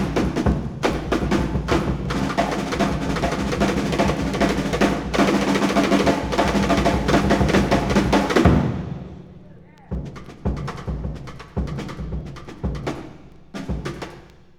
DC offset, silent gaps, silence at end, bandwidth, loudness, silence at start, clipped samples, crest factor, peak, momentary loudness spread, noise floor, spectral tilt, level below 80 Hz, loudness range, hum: under 0.1%; none; 0.35 s; 17.5 kHz; -21 LUFS; 0 s; under 0.1%; 20 dB; -2 dBFS; 15 LU; -44 dBFS; -6 dB/octave; -32 dBFS; 12 LU; none